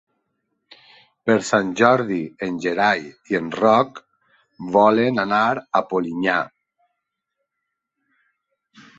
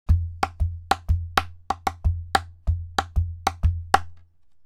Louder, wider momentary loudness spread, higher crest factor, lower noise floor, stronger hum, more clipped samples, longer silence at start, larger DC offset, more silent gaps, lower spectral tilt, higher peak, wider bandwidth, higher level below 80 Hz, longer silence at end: first, -20 LUFS vs -26 LUFS; first, 10 LU vs 5 LU; about the same, 22 dB vs 24 dB; first, -80 dBFS vs -50 dBFS; neither; neither; first, 1.25 s vs 0.1 s; neither; neither; about the same, -5.5 dB/octave vs -5 dB/octave; about the same, 0 dBFS vs -2 dBFS; second, 8.2 kHz vs 15 kHz; second, -64 dBFS vs -30 dBFS; first, 2.5 s vs 0.45 s